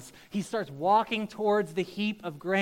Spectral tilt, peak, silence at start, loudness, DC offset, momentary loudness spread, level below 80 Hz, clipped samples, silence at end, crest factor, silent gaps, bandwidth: -5.5 dB/octave; -12 dBFS; 0 s; -29 LUFS; under 0.1%; 10 LU; -68 dBFS; under 0.1%; 0 s; 18 dB; none; 16.5 kHz